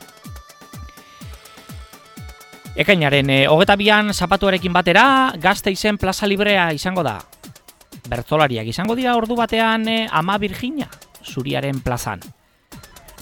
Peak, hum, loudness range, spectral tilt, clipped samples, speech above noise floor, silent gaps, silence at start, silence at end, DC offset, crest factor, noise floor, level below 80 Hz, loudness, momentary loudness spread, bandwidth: 0 dBFS; none; 7 LU; -5 dB/octave; under 0.1%; 26 dB; none; 0 s; 0.4 s; under 0.1%; 20 dB; -44 dBFS; -42 dBFS; -17 LUFS; 25 LU; 19 kHz